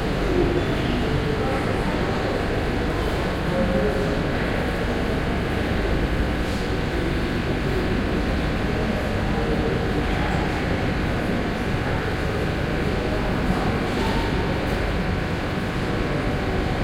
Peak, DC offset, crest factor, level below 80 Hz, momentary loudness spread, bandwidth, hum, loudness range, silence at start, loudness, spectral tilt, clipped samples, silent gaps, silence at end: -8 dBFS; under 0.1%; 16 dB; -30 dBFS; 2 LU; 16 kHz; none; 1 LU; 0 s; -24 LUFS; -6.5 dB/octave; under 0.1%; none; 0 s